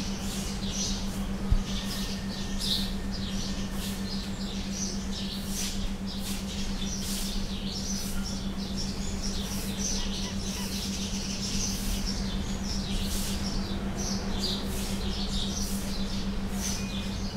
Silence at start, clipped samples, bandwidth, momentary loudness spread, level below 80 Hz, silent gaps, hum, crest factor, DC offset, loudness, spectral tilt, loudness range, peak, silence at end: 0 s; under 0.1%; 16 kHz; 4 LU; -36 dBFS; none; none; 18 dB; under 0.1%; -32 LUFS; -3.5 dB/octave; 2 LU; -12 dBFS; 0 s